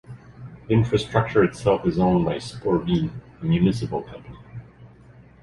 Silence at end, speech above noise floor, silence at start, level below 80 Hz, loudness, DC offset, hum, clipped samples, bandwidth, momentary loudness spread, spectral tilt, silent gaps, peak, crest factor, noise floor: 0.55 s; 27 dB; 0.1 s; -44 dBFS; -22 LUFS; under 0.1%; none; under 0.1%; 11.5 kHz; 21 LU; -7.5 dB/octave; none; -4 dBFS; 20 dB; -49 dBFS